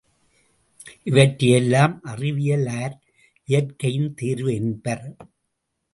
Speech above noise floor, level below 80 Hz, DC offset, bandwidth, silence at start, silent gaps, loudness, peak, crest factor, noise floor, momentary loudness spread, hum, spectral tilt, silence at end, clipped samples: 56 dB; -58 dBFS; under 0.1%; 11.5 kHz; 0.85 s; none; -21 LUFS; 0 dBFS; 22 dB; -77 dBFS; 13 LU; none; -6 dB/octave; 0.7 s; under 0.1%